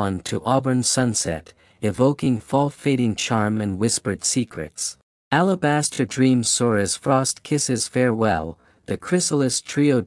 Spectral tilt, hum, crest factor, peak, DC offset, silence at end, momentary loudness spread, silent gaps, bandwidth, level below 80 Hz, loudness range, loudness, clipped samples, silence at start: -4.5 dB/octave; none; 18 dB; -4 dBFS; under 0.1%; 0 s; 8 LU; 5.03-5.31 s; 12 kHz; -56 dBFS; 2 LU; -21 LUFS; under 0.1%; 0 s